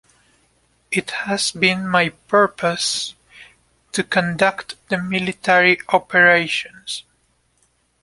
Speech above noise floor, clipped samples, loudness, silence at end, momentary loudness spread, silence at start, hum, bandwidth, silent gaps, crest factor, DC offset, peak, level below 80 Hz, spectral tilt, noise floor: 45 dB; under 0.1%; -18 LUFS; 1 s; 14 LU; 0.9 s; none; 11.5 kHz; none; 20 dB; under 0.1%; 0 dBFS; -58 dBFS; -3.5 dB/octave; -63 dBFS